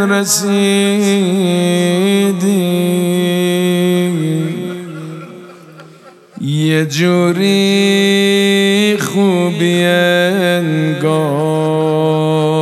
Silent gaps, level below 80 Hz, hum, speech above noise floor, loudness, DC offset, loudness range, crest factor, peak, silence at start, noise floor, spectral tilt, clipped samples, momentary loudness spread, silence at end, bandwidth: none; -68 dBFS; none; 28 dB; -13 LUFS; under 0.1%; 6 LU; 12 dB; 0 dBFS; 0 s; -40 dBFS; -5 dB/octave; under 0.1%; 7 LU; 0 s; 14.5 kHz